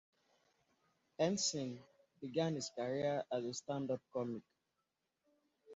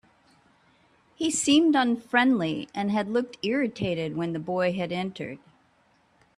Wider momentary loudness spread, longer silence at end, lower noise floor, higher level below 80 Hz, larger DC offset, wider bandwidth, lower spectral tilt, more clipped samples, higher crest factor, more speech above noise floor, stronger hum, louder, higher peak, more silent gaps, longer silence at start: about the same, 13 LU vs 11 LU; second, 0 s vs 1 s; first, -87 dBFS vs -64 dBFS; second, -80 dBFS vs -66 dBFS; neither; second, 7.6 kHz vs 13.5 kHz; about the same, -5 dB/octave vs -4 dB/octave; neither; about the same, 20 dB vs 20 dB; first, 48 dB vs 39 dB; neither; second, -40 LUFS vs -25 LUFS; second, -22 dBFS vs -6 dBFS; neither; about the same, 1.2 s vs 1.2 s